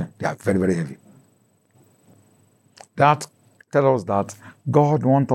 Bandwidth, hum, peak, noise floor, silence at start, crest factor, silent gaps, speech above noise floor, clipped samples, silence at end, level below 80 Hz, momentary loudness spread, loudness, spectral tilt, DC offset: 12.5 kHz; none; -4 dBFS; -61 dBFS; 0 s; 20 dB; none; 42 dB; under 0.1%; 0 s; -70 dBFS; 15 LU; -21 LUFS; -7.5 dB/octave; under 0.1%